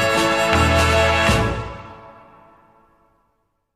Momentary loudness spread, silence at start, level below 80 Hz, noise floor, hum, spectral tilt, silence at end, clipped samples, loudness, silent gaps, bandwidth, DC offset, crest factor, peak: 19 LU; 0 s; -34 dBFS; -69 dBFS; none; -4.5 dB/octave; 1.65 s; under 0.1%; -17 LUFS; none; 15 kHz; under 0.1%; 14 dB; -6 dBFS